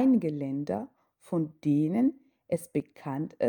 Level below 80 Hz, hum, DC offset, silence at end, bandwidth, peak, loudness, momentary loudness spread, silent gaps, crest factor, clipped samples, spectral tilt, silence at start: -72 dBFS; none; under 0.1%; 0 s; 19 kHz; -14 dBFS; -30 LUFS; 10 LU; none; 14 dB; under 0.1%; -8.5 dB/octave; 0 s